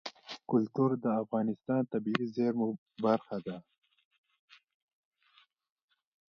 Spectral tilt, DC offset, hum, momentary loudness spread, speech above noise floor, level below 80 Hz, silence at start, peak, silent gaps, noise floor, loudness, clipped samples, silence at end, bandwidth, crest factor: -8 dB/octave; under 0.1%; none; 12 LU; 36 dB; -80 dBFS; 0.05 s; -10 dBFS; 2.78-2.86 s; -68 dBFS; -32 LUFS; under 0.1%; 2.7 s; 7 kHz; 24 dB